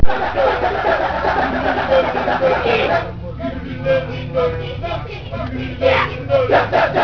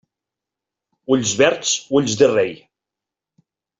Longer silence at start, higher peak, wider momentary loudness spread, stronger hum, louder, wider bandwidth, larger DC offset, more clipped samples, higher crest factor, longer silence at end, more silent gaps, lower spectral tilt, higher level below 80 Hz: second, 0 s vs 1.1 s; about the same, 0 dBFS vs -2 dBFS; first, 11 LU vs 7 LU; neither; about the same, -18 LUFS vs -17 LUFS; second, 5.4 kHz vs 8 kHz; neither; neither; about the same, 16 dB vs 20 dB; second, 0 s vs 1.25 s; neither; first, -7 dB/octave vs -3.5 dB/octave; first, -32 dBFS vs -58 dBFS